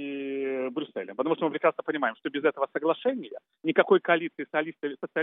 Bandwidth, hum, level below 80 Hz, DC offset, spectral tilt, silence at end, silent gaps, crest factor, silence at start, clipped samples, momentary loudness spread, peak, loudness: 3.9 kHz; none; under -90 dBFS; under 0.1%; -3 dB/octave; 0 s; none; 22 dB; 0 s; under 0.1%; 11 LU; -6 dBFS; -28 LUFS